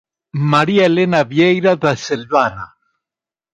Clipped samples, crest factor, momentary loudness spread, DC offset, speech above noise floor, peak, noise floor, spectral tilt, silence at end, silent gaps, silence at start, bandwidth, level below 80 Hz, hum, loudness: under 0.1%; 16 dB; 11 LU; under 0.1%; 74 dB; 0 dBFS; -88 dBFS; -6 dB/octave; 0.9 s; none; 0.35 s; 9.8 kHz; -54 dBFS; none; -15 LUFS